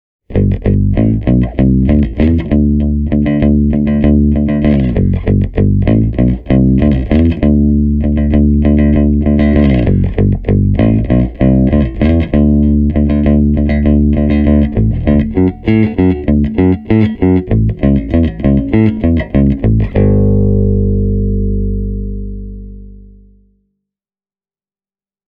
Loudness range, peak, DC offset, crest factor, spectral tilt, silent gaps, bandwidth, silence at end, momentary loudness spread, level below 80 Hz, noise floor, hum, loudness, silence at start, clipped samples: 3 LU; 0 dBFS; under 0.1%; 10 dB; -12 dB/octave; none; 4.6 kHz; 2.3 s; 4 LU; -18 dBFS; under -90 dBFS; 50 Hz at -30 dBFS; -12 LUFS; 0.3 s; under 0.1%